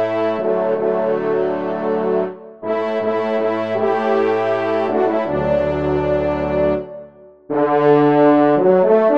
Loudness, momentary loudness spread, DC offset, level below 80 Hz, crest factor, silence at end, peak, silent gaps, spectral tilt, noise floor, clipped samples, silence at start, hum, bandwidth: -17 LUFS; 9 LU; 0.4%; -44 dBFS; 14 dB; 0 s; -2 dBFS; none; -8.5 dB/octave; -41 dBFS; under 0.1%; 0 s; none; 6.4 kHz